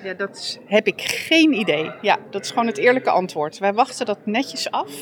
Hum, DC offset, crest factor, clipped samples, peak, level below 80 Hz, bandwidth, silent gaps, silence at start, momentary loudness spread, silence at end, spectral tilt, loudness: none; under 0.1%; 18 dB; under 0.1%; -2 dBFS; -74 dBFS; 20 kHz; none; 0 s; 10 LU; 0 s; -3.5 dB/octave; -20 LUFS